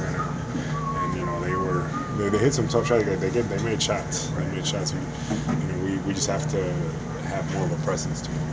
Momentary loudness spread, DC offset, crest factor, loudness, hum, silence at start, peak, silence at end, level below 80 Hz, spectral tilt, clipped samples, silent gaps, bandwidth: 7 LU; under 0.1%; 20 dB; -26 LUFS; none; 0 s; -6 dBFS; 0 s; -42 dBFS; -5 dB/octave; under 0.1%; none; 8 kHz